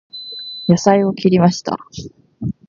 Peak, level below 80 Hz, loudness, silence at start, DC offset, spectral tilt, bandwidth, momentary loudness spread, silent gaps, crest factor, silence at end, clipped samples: 0 dBFS; -48 dBFS; -16 LUFS; 0.15 s; under 0.1%; -6.5 dB/octave; 7.4 kHz; 16 LU; none; 16 dB; 0.15 s; under 0.1%